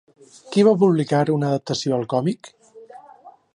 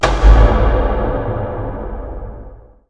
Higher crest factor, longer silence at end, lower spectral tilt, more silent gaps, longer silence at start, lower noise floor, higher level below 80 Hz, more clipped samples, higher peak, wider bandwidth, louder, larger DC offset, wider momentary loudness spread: about the same, 18 dB vs 14 dB; about the same, 0.25 s vs 0.35 s; about the same, -6.5 dB/octave vs -7 dB/octave; neither; first, 0.45 s vs 0 s; first, -47 dBFS vs -36 dBFS; second, -68 dBFS vs -16 dBFS; neither; second, -4 dBFS vs 0 dBFS; first, 11 kHz vs 7.8 kHz; second, -20 LUFS vs -16 LUFS; second, under 0.1% vs 1%; second, 9 LU vs 19 LU